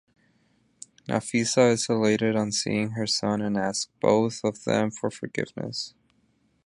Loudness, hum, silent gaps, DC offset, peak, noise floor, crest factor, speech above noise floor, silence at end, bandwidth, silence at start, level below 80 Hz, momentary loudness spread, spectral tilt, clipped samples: -25 LUFS; none; none; under 0.1%; -6 dBFS; -67 dBFS; 20 dB; 42 dB; 0.75 s; 11.5 kHz; 1.1 s; -64 dBFS; 11 LU; -4.5 dB/octave; under 0.1%